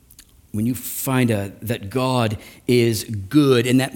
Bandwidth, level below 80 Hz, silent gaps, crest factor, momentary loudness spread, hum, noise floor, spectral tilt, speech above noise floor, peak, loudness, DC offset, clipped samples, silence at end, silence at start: 18 kHz; -52 dBFS; none; 18 dB; 11 LU; none; -49 dBFS; -5.5 dB/octave; 30 dB; -4 dBFS; -20 LUFS; under 0.1%; under 0.1%; 0 s; 0.55 s